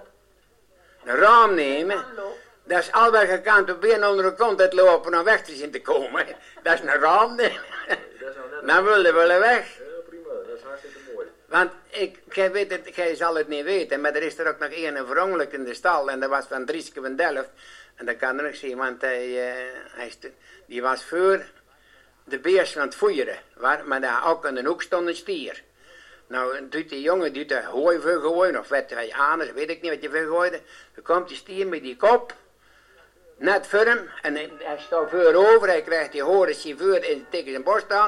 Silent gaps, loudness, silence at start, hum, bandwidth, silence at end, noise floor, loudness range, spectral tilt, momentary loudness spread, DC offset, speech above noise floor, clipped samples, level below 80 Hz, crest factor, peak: none; -22 LUFS; 0 s; none; 12 kHz; 0 s; -60 dBFS; 8 LU; -3.5 dB/octave; 18 LU; under 0.1%; 38 dB; under 0.1%; -64 dBFS; 18 dB; -4 dBFS